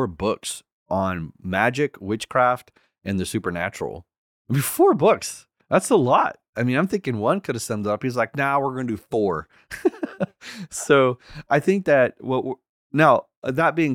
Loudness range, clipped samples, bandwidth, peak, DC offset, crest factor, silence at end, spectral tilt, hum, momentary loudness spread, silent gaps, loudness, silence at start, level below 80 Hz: 4 LU; under 0.1%; 18.5 kHz; -2 dBFS; under 0.1%; 20 dB; 0 s; -5.5 dB/octave; none; 14 LU; 0.72-0.86 s, 4.18-4.45 s, 6.49-6.53 s, 12.69-12.90 s, 13.37-13.42 s; -22 LUFS; 0 s; -58 dBFS